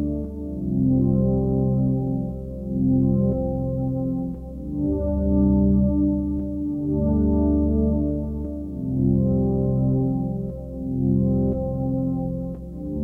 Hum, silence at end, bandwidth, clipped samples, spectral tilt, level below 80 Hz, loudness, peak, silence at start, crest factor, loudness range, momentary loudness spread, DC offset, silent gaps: none; 0 s; 1.6 kHz; under 0.1%; -13.5 dB/octave; -32 dBFS; -23 LUFS; -8 dBFS; 0 s; 14 dB; 3 LU; 10 LU; under 0.1%; none